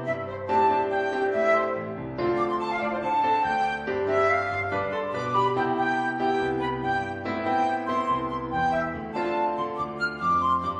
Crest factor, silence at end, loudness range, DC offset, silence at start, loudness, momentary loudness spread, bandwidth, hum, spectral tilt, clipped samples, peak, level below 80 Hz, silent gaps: 14 dB; 0 s; 2 LU; under 0.1%; 0 s; -26 LUFS; 7 LU; 10 kHz; none; -6.5 dB/octave; under 0.1%; -12 dBFS; -54 dBFS; none